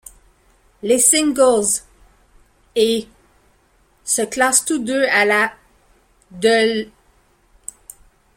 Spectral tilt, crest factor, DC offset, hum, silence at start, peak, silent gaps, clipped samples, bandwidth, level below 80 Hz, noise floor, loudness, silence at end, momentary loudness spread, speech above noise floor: -1.5 dB/octave; 20 dB; under 0.1%; none; 0.85 s; 0 dBFS; none; under 0.1%; 16.5 kHz; -54 dBFS; -58 dBFS; -16 LUFS; 1.5 s; 21 LU; 41 dB